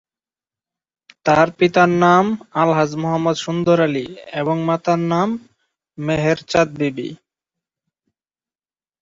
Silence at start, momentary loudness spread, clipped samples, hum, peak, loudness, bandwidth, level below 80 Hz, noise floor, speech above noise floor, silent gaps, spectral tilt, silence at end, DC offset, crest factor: 1.25 s; 11 LU; under 0.1%; none; -2 dBFS; -18 LUFS; 7.8 kHz; -56 dBFS; under -90 dBFS; over 73 dB; none; -6.5 dB/octave; 1.85 s; under 0.1%; 18 dB